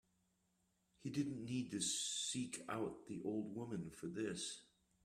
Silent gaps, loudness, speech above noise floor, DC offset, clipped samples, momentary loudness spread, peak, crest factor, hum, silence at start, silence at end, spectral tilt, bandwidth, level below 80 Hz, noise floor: none; -44 LUFS; 38 dB; under 0.1%; under 0.1%; 8 LU; -28 dBFS; 18 dB; none; 1 s; 0.4 s; -3.5 dB/octave; 15.5 kHz; -78 dBFS; -82 dBFS